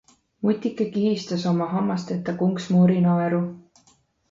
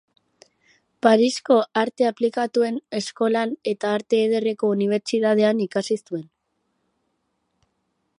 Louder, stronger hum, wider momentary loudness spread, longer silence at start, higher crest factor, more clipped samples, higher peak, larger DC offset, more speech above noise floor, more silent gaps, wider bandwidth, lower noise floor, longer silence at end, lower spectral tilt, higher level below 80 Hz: about the same, -23 LUFS vs -21 LUFS; neither; about the same, 8 LU vs 8 LU; second, 0.4 s vs 1.05 s; second, 14 dB vs 20 dB; neither; second, -8 dBFS vs -2 dBFS; neither; second, 40 dB vs 52 dB; neither; second, 7.6 kHz vs 11 kHz; second, -61 dBFS vs -73 dBFS; second, 0.7 s vs 1.95 s; first, -8 dB/octave vs -5 dB/octave; first, -64 dBFS vs -76 dBFS